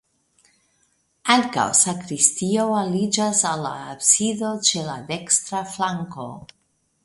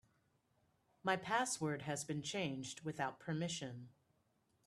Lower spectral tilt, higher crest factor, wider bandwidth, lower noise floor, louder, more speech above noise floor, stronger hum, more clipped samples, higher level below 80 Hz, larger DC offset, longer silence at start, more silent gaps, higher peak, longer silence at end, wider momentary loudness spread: second, -2.5 dB/octave vs -4 dB/octave; about the same, 22 dB vs 22 dB; second, 11.5 kHz vs 13 kHz; second, -66 dBFS vs -79 dBFS; first, -20 LUFS vs -41 LUFS; first, 44 dB vs 38 dB; neither; neither; first, -64 dBFS vs -80 dBFS; neither; first, 1.25 s vs 1.05 s; neither; first, 0 dBFS vs -22 dBFS; second, 0.6 s vs 0.75 s; first, 13 LU vs 9 LU